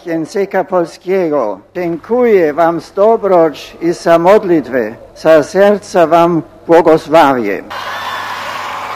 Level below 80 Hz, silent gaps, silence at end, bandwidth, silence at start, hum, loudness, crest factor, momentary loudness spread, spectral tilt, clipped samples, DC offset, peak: -50 dBFS; none; 0 s; 15.5 kHz; 0.05 s; none; -12 LUFS; 12 dB; 12 LU; -6 dB/octave; 0.7%; under 0.1%; 0 dBFS